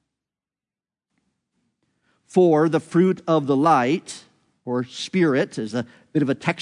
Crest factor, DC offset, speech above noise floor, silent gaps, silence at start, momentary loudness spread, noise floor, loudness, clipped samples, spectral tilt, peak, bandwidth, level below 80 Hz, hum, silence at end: 18 dB; under 0.1%; over 70 dB; none; 2.35 s; 11 LU; under -90 dBFS; -21 LUFS; under 0.1%; -6.5 dB/octave; -4 dBFS; 10.5 kHz; -72 dBFS; none; 0 s